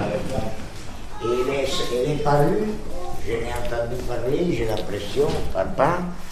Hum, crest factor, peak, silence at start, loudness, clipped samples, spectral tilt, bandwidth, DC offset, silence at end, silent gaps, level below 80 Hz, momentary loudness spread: none; 18 dB; -4 dBFS; 0 s; -24 LUFS; under 0.1%; -6 dB/octave; 15 kHz; under 0.1%; 0 s; none; -36 dBFS; 12 LU